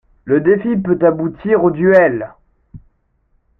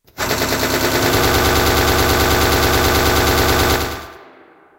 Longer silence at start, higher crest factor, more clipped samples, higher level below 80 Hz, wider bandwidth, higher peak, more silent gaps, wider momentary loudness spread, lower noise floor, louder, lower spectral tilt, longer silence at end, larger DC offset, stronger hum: about the same, 0.25 s vs 0.15 s; about the same, 14 dB vs 14 dB; neither; second, -48 dBFS vs -26 dBFS; second, 4.5 kHz vs 16 kHz; about the same, -2 dBFS vs -2 dBFS; neither; first, 9 LU vs 5 LU; first, -60 dBFS vs -46 dBFS; about the same, -14 LUFS vs -15 LUFS; first, -10.5 dB/octave vs -3.5 dB/octave; first, 0.85 s vs 0.55 s; neither; neither